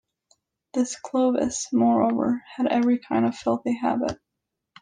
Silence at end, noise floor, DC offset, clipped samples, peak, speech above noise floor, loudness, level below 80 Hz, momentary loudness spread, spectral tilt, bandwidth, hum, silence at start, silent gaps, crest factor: 0.65 s; -83 dBFS; under 0.1%; under 0.1%; -10 dBFS; 60 dB; -24 LUFS; -60 dBFS; 7 LU; -5 dB/octave; 9.8 kHz; none; 0.75 s; none; 16 dB